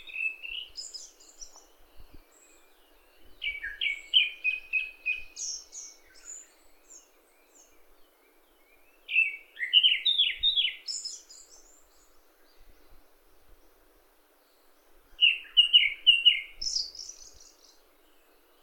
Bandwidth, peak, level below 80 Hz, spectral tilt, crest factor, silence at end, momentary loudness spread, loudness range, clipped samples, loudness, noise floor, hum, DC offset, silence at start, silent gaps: 18 kHz; -8 dBFS; -62 dBFS; 3.5 dB/octave; 24 dB; 1.4 s; 25 LU; 17 LU; under 0.1%; -25 LUFS; -63 dBFS; none; under 0.1%; 0.05 s; none